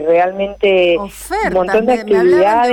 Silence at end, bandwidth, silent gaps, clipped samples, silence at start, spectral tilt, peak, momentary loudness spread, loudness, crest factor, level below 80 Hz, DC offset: 0 s; 17.5 kHz; none; under 0.1%; 0 s; -5 dB/octave; -4 dBFS; 8 LU; -13 LUFS; 8 dB; -42 dBFS; under 0.1%